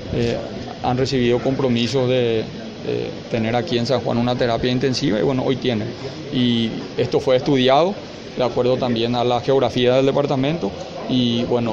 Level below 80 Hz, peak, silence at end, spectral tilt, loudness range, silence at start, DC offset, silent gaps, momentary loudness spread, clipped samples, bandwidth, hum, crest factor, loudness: -46 dBFS; -4 dBFS; 0 s; -6.5 dB/octave; 2 LU; 0 s; under 0.1%; none; 9 LU; under 0.1%; 8 kHz; none; 16 dB; -20 LUFS